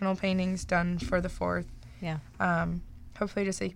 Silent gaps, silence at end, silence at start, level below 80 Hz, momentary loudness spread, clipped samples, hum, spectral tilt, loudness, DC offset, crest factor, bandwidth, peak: none; 0 s; 0 s; -46 dBFS; 10 LU; under 0.1%; none; -6 dB/octave; -31 LUFS; under 0.1%; 16 dB; 11.5 kHz; -14 dBFS